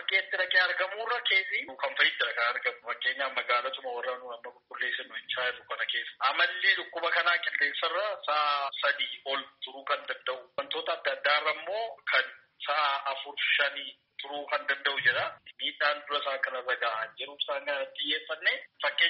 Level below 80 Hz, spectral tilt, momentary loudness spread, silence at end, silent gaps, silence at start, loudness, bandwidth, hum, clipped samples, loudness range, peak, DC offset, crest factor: -84 dBFS; 4 dB/octave; 10 LU; 0 s; none; 0 s; -29 LUFS; 5.8 kHz; none; under 0.1%; 4 LU; -10 dBFS; under 0.1%; 20 dB